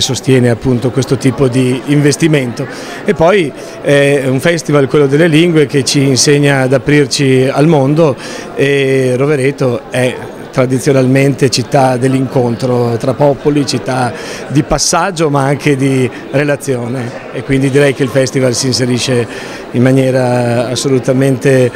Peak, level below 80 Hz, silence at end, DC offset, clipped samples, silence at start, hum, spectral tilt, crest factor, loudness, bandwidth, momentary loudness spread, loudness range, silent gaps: 0 dBFS; -40 dBFS; 0 s; under 0.1%; 0.2%; 0 s; none; -5.5 dB/octave; 10 dB; -11 LUFS; 16 kHz; 7 LU; 3 LU; none